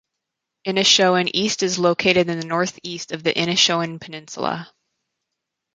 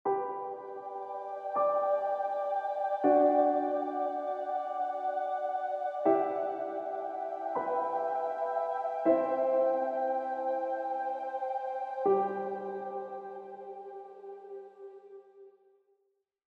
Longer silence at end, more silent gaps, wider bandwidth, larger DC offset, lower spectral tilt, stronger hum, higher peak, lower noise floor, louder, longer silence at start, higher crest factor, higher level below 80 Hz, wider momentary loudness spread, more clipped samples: about the same, 1.1 s vs 1.05 s; neither; first, 9.6 kHz vs 6.2 kHz; neither; second, -3 dB/octave vs -7.5 dB/octave; neither; first, -2 dBFS vs -14 dBFS; about the same, -81 dBFS vs -78 dBFS; first, -19 LUFS vs -32 LUFS; first, 0.65 s vs 0.05 s; about the same, 20 dB vs 18 dB; first, -62 dBFS vs under -90 dBFS; about the same, 16 LU vs 16 LU; neither